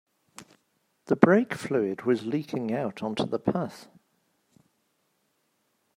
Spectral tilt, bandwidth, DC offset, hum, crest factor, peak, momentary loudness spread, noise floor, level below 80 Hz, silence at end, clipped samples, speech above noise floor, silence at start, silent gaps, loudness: -7 dB/octave; 15 kHz; under 0.1%; none; 26 dB; -2 dBFS; 11 LU; -73 dBFS; -70 dBFS; 2.1 s; under 0.1%; 47 dB; 0.4 s; none; -27 LUFS